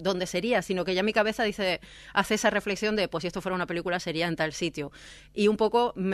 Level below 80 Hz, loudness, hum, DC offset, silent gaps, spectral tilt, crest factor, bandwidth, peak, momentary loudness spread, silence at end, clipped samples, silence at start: -56 dBFS; -27 LUFS; none; under 0.1%; none; -4.5 dB/octave; 20 dB; 14 kHz; -8 dBFS; 8 LU; 0 s; under 0.1%; 0 s